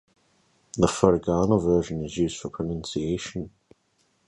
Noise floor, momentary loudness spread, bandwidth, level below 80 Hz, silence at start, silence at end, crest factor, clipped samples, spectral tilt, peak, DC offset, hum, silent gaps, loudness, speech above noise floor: -69 dBFS; 14 LU; 11.5 kHz; -46 dBFS; 0.75 s; 0.8 s; 24 dB; under 0.1%; -6 dB/octave; -2 dBFS; under 0.1%; none; none; -25 LUFS; 44 dB